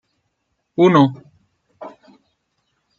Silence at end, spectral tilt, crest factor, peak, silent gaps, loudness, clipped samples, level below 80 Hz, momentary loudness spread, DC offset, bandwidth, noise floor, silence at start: 1.1 s; -8 dB/octave; 20 dB; -2 dBFS; none; -15 LUFS; under 0.1%; -66 dBFS; 26 LU; under 0.1%; 7 kHz; -72 dBFS; 0.8 s